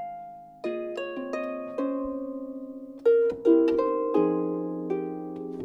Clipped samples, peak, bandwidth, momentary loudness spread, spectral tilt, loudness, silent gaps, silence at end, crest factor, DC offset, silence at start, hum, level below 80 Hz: under 0.1%; -10 dBFS; 7.4 kHz; 16 LU; -8 dB/octave; -27 LUFS; none; 0 s; 18 dB; under 0.1%; 0 s; none; -64 dBFS